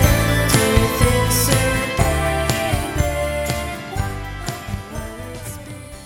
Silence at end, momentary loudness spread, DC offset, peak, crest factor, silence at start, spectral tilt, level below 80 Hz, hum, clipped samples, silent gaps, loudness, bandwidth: 0 s; 15 LU; under 0.1%; 0 dBFS; 18 dB; 0 s; -4.5 dB/octave; -26 dBFS; none; under 0.1%; none; -19 LUFS; 17 kHz